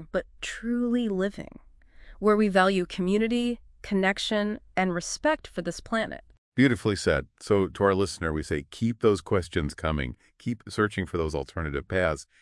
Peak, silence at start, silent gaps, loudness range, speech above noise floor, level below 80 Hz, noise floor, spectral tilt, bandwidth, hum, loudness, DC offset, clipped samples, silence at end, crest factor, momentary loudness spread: -8 dBFS; 0 s; 6.38-6.52 s; 3 LU; 23 dB; -46 dBFS; -49 dBFS; -5.5 dB/octave; 12 kHz; none; -27 LUFS; under 0.1%; under 0.1%; 0.2 s; 20 dB; 11 LU